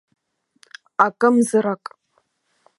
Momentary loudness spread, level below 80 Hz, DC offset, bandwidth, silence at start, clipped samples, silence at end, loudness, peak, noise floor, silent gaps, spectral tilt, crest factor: 15 LU; -76 dBFS; under 0.1%; 11.5 kHz; 1 s; under 0.1%; 1.05 s; -19 LUFS; 0 dBFS; -67 dBFS; none; -5.5 dB/octave; 22 dB